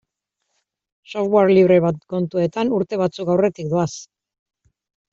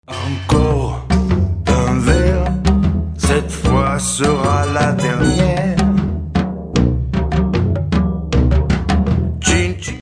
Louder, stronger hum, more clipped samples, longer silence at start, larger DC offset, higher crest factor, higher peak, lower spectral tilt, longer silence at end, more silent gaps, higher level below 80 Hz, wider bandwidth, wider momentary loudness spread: second, -19 LUFS vs -16 LUFS; neither; neither; first, 1.1 s vs 0.1 s; neither; about the same, 16 dB vs 14 dB; about the same, -4 dBFS vs -2 dBFS; about the same, -7 dB/octave vs -6 dB/octave; first, 1.1 s vs 0 s; neither; second, -60 dBFS vs -22 dBFS; second, 7.6 kHz vs 11 kHz; first, 12 LU vs 4 LU